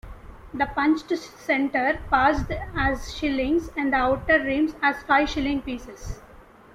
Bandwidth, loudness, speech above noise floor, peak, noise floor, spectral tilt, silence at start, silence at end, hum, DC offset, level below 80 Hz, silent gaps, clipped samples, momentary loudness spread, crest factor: 14.5 kHz; -23 LUFS; 25 dB; -6 dBFS; -49 dBFS; -5.5 dB/octave; 0.05 s; 0.4 s; none; under 0.1%; -40 dBFS; none; under 0.1%; 14 LU; 18 dB